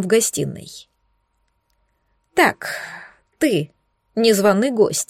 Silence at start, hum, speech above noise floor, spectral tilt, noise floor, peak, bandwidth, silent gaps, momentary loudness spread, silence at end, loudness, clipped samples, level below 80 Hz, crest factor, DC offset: 0 s; none; 50 dB; -4 dB/octave; -68 dBFS; -4 dBFS; 16.5 kHz; none; 20 LU; 0.05 s; -19 LUFS; under 0.1%; -62 dBFS; 18 dB; under 0.1%